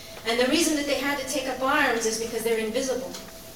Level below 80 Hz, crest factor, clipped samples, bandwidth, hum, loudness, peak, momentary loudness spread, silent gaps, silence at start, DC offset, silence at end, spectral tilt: -54 dBFS; 18 dB; under 0.1%; 18 kHz; none; -25 LUFS; -8 dBFS; 7 LU; none; 0 s; 0.2%; 0 s; -2 dB/octave